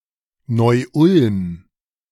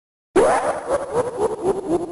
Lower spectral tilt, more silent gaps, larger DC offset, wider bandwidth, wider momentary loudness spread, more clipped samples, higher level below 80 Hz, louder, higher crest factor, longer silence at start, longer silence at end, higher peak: first, -8 dB/octave vs -5 dB/octave; neither; neither; about the same, 12.5 kHz vs 11.5 kHz; first, 14 LU vs 6 LU; neither; about the same, -52 dBFS vs -48 dBFS; first, -16 LUFS vs -21 LUFS; about the same, 16 dB vs 14 dB; first, 0.5 s vs 0.35 s; first, 0.55 s vs 0 s; first, -2 dBFS vs -8 dBFS